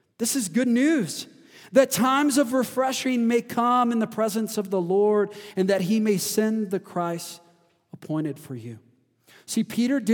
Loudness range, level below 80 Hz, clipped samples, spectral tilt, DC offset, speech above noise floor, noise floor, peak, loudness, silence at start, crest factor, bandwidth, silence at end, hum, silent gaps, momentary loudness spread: 8 LU; -76 dBFS; under 0.1%; -4.5 dB/octave; under 0.1%; 38 dB; -61 dBFS; -6 dBFS; -24 LUFS; 0.2 s; 18 dB; 19.5 kHz; 0 s; none; none; 11 LU